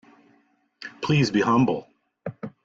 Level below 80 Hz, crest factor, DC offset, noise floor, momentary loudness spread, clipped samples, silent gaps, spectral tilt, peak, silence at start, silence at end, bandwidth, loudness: -58 dBFS; 16 dB; under 0.1%; -64 dBFS; 19 LU; under 0.1%; none; -6.5 dB/octave; -10 dBFS; 0.8 s; 0.15 s; 7.8 kHz; -22 LUFS